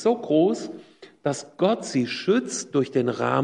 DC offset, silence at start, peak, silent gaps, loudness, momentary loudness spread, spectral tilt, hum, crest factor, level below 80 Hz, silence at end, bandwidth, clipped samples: under 0.1%; 0 s; -6 dBFS; none; -24 LUFS; 10 LU; -5 dB/octave; none; 16 dB; -72 dBFS; 0 s; 11 kHz; under 0.1%